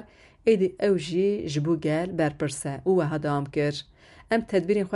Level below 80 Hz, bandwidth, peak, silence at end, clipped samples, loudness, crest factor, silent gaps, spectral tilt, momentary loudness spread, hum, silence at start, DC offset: -56 dBFS; 11.5 kHz; -10 dBFS; 0 s; under 0.1%; -26 LUFS; 16 dB; none; -6.5 dB/octave; 6 LU; none; 0 s; under 0.1%